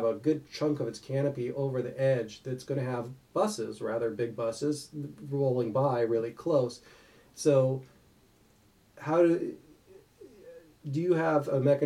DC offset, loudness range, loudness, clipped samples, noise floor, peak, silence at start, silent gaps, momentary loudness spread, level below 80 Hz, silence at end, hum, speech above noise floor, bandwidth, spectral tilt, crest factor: under 0.1%; 3 LU; -30 LUFS; under 0.1%; -63 dBFS; -12 dBFS; 0 s; none; 12 LU; -70 dBFS; 0 s; none; 34 dB; 14.5 kHz; -7 dB/octave; 18 dB